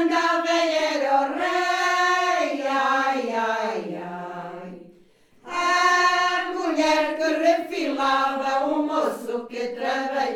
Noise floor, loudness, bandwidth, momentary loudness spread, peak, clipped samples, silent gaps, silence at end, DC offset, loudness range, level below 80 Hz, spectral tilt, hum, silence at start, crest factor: -55 dBFS; -22 LUFS; 17 kHz; 12 LU; -8 dBFS; under 0.1%; none; 0 s; under 0.1%; 4 LU; -66 dBFS; -2.5 dB/octave; none; 0 s; 16 dB